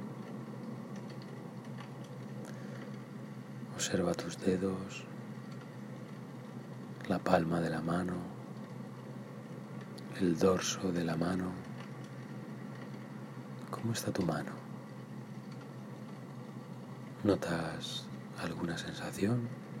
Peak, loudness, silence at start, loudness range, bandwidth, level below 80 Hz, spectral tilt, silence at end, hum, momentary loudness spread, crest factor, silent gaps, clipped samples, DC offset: -12 dBFS; -38 LUFS; 0 s; 5 LU; 16 kHz; -68 dBFS; -5.5 dB/octave; 0 s; none; 14 LU; 24 dB; none; under 0.1%; under 0.1%